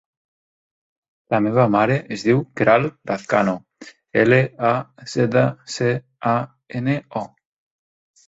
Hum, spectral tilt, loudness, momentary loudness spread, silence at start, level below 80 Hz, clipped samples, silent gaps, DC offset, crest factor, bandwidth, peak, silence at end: none; -7 dB/octave; -20 LUFS; 11 LU; 1.3 s; -58 dBFS; under 0.1%; none; under 0.1%; 20 dB; 8 kHz; -2 dBFS; 1 s